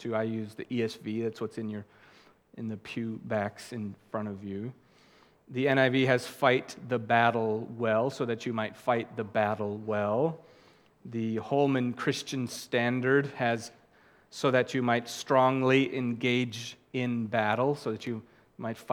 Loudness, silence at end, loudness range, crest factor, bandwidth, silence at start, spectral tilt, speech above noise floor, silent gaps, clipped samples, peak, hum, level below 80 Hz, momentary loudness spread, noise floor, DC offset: -30 LUFS; 0 s; 9 LU; 22 dB; 17 kHz; 0 s; -6 dB/octave; 32 dB; none; under 0.1%; -8 dBFS; none; -76 dBFS; 14 LU; -61 dBFS; under 0.1%